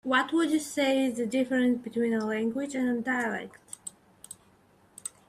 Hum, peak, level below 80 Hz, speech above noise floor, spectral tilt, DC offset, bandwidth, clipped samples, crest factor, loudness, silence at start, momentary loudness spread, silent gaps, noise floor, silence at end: none; -12 dBFS; -70 dBFS; 34 dB; -4 dB/octave; under 0.1%; 15 kHz; under 0.1%; 16 dB; -28 LUFS; 0.05 s; 18 LU; none; -62 dBFS; 0.2 s